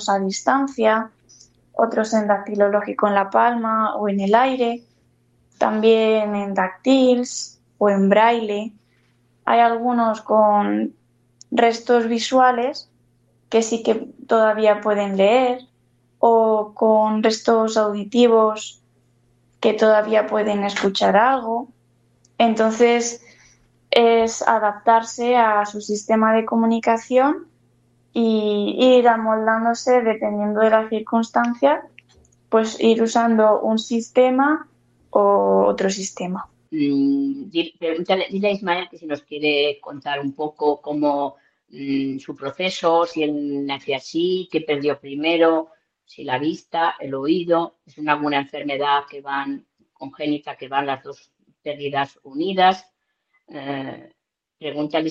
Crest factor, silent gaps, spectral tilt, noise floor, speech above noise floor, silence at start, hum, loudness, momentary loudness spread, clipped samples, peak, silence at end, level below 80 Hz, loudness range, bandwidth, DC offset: 20 dB; none; -4.5 dB/octave; -69 dBFS; 50 dB; 0 s; none; -19 LUFS; 13 LU; under 0.1%; 0 dBFS; 0 s; -66 dBFS; 6 LU; 8.4 kHz; under 0.1%